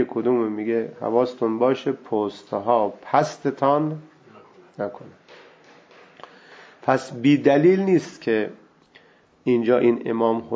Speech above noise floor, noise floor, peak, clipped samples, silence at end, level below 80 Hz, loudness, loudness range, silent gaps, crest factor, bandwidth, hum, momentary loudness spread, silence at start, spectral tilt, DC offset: 34 dB; -55 dBFS; -4 dBFS; under 0.1%; 0 s; -70 dBFS; -22 LUFS; 8 LU; none; 20 dB; 8 kHz; none; 12 LU; 0 s; -7 dB/octave; under 0.1%